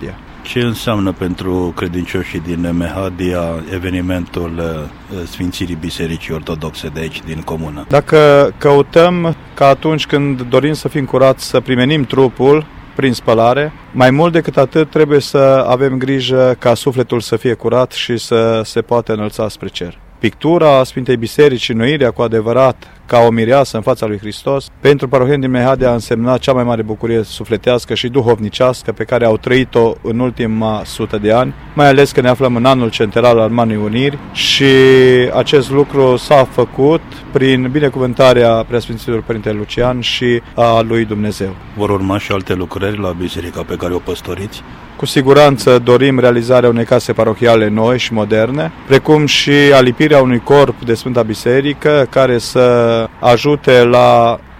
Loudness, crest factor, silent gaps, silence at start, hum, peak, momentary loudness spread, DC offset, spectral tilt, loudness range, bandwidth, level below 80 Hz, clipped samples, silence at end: -12 LUFS; 12 dB; none; 0 s; none; 0 dBFS; 12 LU; under 0.1%; -6 dB/octave; 8 LU; 16 kHz; -38 dBFS; 0.2%; 0.05 s